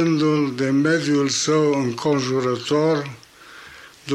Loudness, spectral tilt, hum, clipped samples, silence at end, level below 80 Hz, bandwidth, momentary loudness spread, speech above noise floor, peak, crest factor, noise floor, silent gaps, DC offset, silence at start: -20 LUFS; -5 dB/octave; none; under 0.1%; 0 s; -62 dBFS; 12 kHz; 14 LU; 24 dB; -8 dBFS; 12 dB; -43 dBFS; none; under 0.1%; 0 s